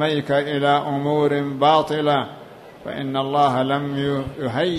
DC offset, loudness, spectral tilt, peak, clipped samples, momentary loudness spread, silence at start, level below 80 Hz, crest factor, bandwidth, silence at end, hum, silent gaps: under 0.1%; -20 LUFS; -6.5 dB/octave; -4 dBFS; under 0.1%; 11 LU; 0 s; -54 dBFS; 16 dB; 14 kHz; 0 s; none; none